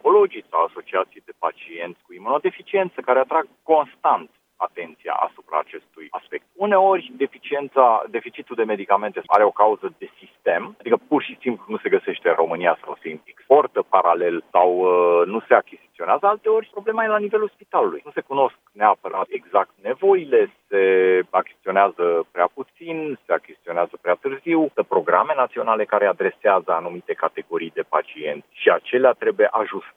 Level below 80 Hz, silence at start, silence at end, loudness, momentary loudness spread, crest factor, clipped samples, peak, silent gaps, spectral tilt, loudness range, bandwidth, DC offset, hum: -78 dBFS; 0.05 s; 0.1 s; -21 LUFS; 12 LU; 20 dB; under 0.1%; 0 dBFS; none; -7.5 dB/octave; 4 LU; 3.9 kHz; under 0.1%; none